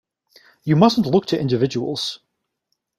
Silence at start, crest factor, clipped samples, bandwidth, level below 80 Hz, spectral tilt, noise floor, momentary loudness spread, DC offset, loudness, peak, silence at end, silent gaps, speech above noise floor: 0.65 s; 20 dB; under 0.1%; 14 kHz; -58 dBFS; -6.5 dB/octave; -75 dBFS; 13 LU; under 0.1%; -19 LUFS; -2 dBFS; 0.8 s; none; 57 dB